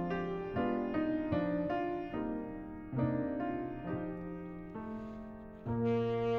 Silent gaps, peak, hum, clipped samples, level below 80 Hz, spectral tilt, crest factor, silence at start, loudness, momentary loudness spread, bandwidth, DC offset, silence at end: none; -22 dBFS; none; under 0.1%; -56 dBFS; -9.5 dB/octave; 14 dB; 0 s; -37 LUFS; 11 LU; 6.4 kHz; under 0.1%; 0 s